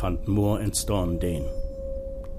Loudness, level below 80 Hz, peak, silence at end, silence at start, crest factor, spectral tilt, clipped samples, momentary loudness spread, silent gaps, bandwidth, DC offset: -27 LUFS; -32 dBFS; -12 dBFS; 0 s; 0 s; 14 dB; -5.5 dB/octave; under 0.1%; 11 LU; none; 15.5 kHz; under 0.1%